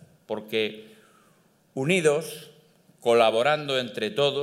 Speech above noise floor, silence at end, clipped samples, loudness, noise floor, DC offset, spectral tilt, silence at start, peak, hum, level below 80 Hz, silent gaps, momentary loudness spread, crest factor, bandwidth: 38 dB; 0 s; under 0.1%; -25 LUFS; -62 dBFS; under 0.1%; -4.5 dB/octave; 0.3 s; -6 dBFS; none; -76 dBFS; none; 18 LU; 20 dB; 15.5 kHz